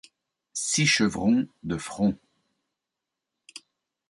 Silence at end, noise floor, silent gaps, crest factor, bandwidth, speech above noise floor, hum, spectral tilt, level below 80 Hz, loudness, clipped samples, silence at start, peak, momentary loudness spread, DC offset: 0.5 s; -86 dBFS; none; 18 dB; 11.5 kHz; 62 dB; none; -3.5 dB/octave; -58 dBFS; -25 LUFS; under 0.1%; 0.55 s; -10 dBFS; 24 LU; under 0.1%